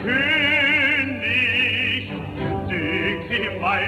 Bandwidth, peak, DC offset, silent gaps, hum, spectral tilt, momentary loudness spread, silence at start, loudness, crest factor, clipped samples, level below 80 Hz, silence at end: 15.5 kHz; -8 dBFS; under 0.1%; none; none; -5.5 dB/octave; 10 LU; 0 s; -19 LUFS; 14 dB; under 0.1%; -46 dBFS; 0 s